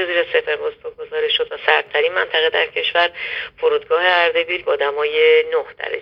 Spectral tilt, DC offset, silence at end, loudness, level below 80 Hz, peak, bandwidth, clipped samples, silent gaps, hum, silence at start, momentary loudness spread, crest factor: -3.5 dB/octave; under 0.1%; 0 s; -17 LUFS; -60 dBFS; 0 dBFS; 5.4 kHz; under 0.1%; none; none; 0 s; 10 LU; 18 dB